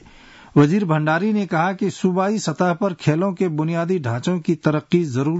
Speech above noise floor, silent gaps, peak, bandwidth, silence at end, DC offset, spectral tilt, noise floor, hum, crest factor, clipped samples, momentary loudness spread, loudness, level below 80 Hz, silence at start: 26 dB; none; -6 dBFS; 8 kHz; 0 s; under 0.1%; -7 dB/octave; -45 dBFS; none; 14 dB; under 0.1%; 5 LU; -20 LUFS; -58 dBFS; 0.55 s